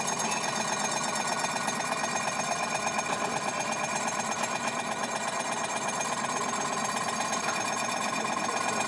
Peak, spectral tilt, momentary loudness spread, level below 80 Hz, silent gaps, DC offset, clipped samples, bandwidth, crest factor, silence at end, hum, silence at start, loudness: -16 dBFS; -2 dB/octave; 2 LU; -74 dBFS; none; under 0.1%; under 0.1%; 11.5 kHz; 14 dB; 0 s; none; 0 s; -29 LUFS